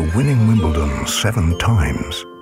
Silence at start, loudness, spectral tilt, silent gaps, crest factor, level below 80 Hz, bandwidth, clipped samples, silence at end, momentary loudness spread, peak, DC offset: 0 s; -17 LUFS; -5.5 dB/octave; none; 14 dB; -28 dBFS; 16.5 kHz; under 0.1%; 0 s; 6 LU; -4 dBFS; under 0.1%